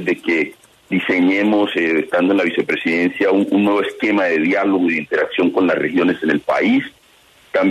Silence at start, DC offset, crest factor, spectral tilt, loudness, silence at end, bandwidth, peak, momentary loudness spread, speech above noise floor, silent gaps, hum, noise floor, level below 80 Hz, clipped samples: 0 s; under 0.1%; 12 dB; -6.5 dB/octave; -17 LUFS; 0 s; 12.5 kHz; -4 dBFS; 4 LU; 34 dB; none; none; -51 dBFS; -62 dBFS; under 0.1%